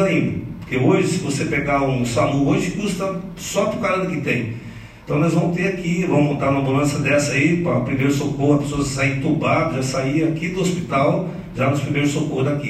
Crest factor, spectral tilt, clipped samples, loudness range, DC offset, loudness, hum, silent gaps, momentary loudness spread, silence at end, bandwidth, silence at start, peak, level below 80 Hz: 16 dB; -6 dB/octave; under 0.1%; 3 LU; under 0.1%; -20 LUFS; none; none; 7 LU; 0 s; 13.5 kHz; 0 s; -4 dBFS; -44 dBFS